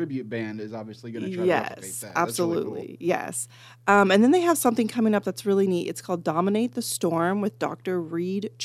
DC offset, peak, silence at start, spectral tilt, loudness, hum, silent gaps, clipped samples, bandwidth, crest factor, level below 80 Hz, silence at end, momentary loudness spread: under 0.1%; -4 dBFS; 0 s; -5 dB/octave; -25 LUFS; none; none; under 0.1%; 15.5 kHz; 20 dB; -74 dBFS; 0 s; 14 LU